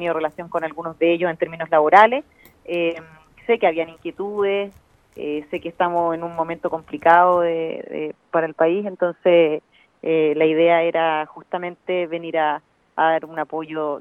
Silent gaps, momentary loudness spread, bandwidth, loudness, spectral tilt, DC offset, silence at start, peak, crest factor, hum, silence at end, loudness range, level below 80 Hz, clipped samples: none; 14 LU; 5.6 kHz; -20 LUFS; -7 dB/octave; under 0.1%; 0 s; 0 dBFS; 20 dB; none; 0 s; 5 LU; -64 dBFS; under 0.1%